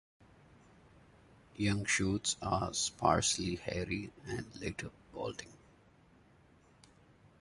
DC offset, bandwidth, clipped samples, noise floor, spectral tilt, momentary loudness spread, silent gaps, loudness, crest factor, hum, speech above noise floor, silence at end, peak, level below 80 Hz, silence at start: under 0.1%; 11.5 kHz; under 0.1%; -64 dBFS; -3.5 dB/octave; 14 LU; none; -35 LUFS; 24 dB; none; 29 dB; 1.85 s; -14 dBFS; -56 dBFS; 1.55 s